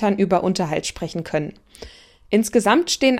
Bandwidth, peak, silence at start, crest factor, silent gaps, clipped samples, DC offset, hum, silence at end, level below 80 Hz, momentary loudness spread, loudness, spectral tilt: 16 kHz; -2 dBFS; 0 s; 18 dB; none; under 0.1%; under 0.1%; none; 0 s; -50 dBFS; 15 LU; -20 LUFS; -4.5 dB/octave